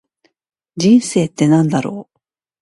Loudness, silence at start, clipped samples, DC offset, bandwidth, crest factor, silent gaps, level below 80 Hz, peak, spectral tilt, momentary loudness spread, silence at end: -14 LUFS; 0.75 s; under 0.1%; under 0.1%; 11.5 kHz; 16 dB; none; -58 dBFS; 0 dBFS; -6 dB/octave; 17 LU; 0.6 s